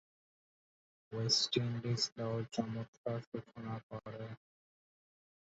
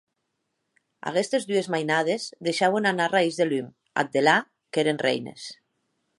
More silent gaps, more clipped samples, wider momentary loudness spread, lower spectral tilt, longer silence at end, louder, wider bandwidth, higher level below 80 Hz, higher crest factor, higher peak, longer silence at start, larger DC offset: first, 2.12-2.16 s, 2.88-3.04 s, 3.27-3.32 s, 3.83-3.90 s vs none; neither; first, 16 LU vs 9 LU; about the same, -4.5 dB/octave vs -4 dB/octave; first, 1.05 s vs 0.65 s; second, -38 LUFS vs -24 LUFS; second, 8 kHz vs 11.5 kHz; about the same, -72 dBFS vs -76 dBFS; about the same, 24 dB vs 20 dB; second, -18 dBFS vs -6 dBFS; about the same, 1.1 s vs 1.05 s; neither